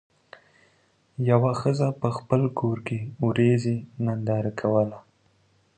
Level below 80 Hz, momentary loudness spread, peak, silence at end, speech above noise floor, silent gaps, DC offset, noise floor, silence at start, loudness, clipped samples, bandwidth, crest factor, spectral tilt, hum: -62 dBFS; 8 LU; -6 dBFS; 0.8 s; 40 dB; none; under 0.1%; -64 dBFS; 1.2 s; -25 LUFS; under 0.1%; 9.2 kHz; 20 dB; -8.5 dB/octave; none